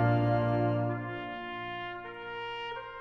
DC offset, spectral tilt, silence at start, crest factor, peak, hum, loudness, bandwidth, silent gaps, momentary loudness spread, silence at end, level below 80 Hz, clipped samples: under 0.1%; -9 dB/octave; 0 s; 16 dB; -16 dBFS; none; -33 LUFS; 5.4 kHz; none; 12 LU; 0 s; -58 dBFS; under 0.1%